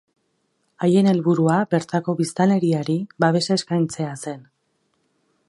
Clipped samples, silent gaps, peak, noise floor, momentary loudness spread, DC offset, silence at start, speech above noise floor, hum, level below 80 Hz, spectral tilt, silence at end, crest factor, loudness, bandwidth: under 0.1%; none; -4 dBFS; -70 dBFS; 11 LU; under 0.1%; 0.8 s; 50 dB; none; -66 dBFS; -6.5 dB/octave; 1.1 s; 18 dB; -20 LUFS; 11.5 kHz